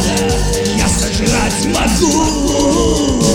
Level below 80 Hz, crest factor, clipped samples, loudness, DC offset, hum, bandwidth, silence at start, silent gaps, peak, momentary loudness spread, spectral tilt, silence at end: -22 dBFS; 12 dB; under 0.1%; -13 LUFS; under 0.1%; none; 17 kHz; 0 s; none; 0 dBFS; 2 LU; -4 dB/octave; 0 s